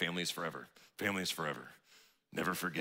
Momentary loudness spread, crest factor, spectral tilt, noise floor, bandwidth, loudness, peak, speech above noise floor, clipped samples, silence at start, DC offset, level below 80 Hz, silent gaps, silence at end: 15 LU; 22 dB; -3.5 dB/octave; -66 dBFS; 16 kHz; -38 LUFS; -18 dBFS; 27 dB; under 0.1%; 0 s; under 0.1%; -78 dBFS; none; 0 s